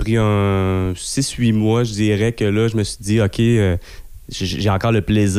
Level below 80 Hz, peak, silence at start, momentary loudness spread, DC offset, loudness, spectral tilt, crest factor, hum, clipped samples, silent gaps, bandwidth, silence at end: -36 dBFS; -6 dBFS; 0 s; 6 LU; under 0.1%; -18 LUFS; -6 dB/octave; 10 dB; none; under 0.1%; none; 15 kHz; 0 s